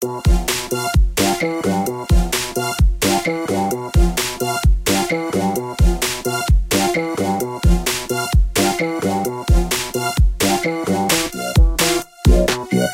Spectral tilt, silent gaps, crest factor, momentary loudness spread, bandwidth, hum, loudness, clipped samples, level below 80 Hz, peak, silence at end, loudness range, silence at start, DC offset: -4.5 dB/octave; none; 14 dB; 4 LU; 17 kHz; none; -18 LUFS; under 0.1%; -20 dBFS; -2 dBFS; 0 s; 1 LU; 0 s; under 0.1%